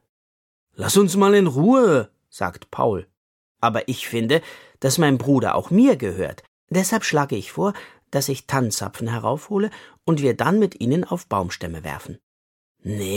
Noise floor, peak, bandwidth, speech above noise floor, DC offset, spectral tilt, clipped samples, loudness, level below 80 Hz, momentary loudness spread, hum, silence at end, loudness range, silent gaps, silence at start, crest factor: under -90 dBFS; -4 dBFS; 17 kHz; over 70 dB; under 0.1%; -5.5 dB/octave; under 0.1%; -21 LUFS; -56 dBFS; 14 LU; none; 0 s; 4 LU; 3.17-3.55 s, 6.48-6.67 s, 12.23-12.75 s; 0.8 s; 18 dB